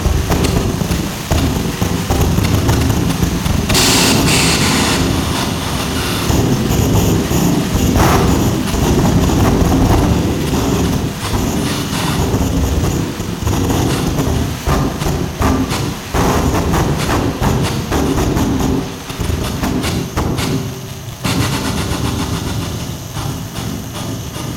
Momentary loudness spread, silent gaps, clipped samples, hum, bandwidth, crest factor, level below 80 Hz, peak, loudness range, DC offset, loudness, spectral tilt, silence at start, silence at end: 9 LU; none; under 0.1%; none; 17.5 kHz; 14 dB; -24 dBFS; -2 dBFS; 6 LU; under 0.1%; -15 LUFS; -5 dB/octave; 0 s; 0 s